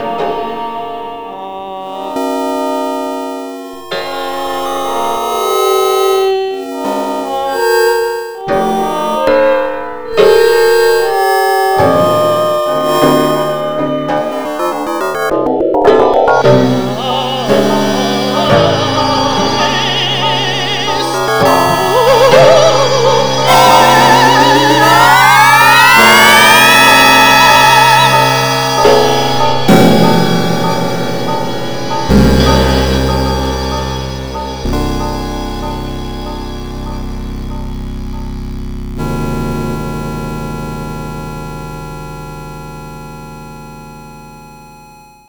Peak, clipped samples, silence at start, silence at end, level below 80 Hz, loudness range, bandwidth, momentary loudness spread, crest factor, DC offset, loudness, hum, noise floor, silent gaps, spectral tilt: 0 dBFS; 1%; 0 s; 0.05 s; -28 dBFS; 17 LU; over 20 kHz; 19 LU; 12 dB; 1%; -10 LUFS; none; -38 dBFS; none; -4 dB/octave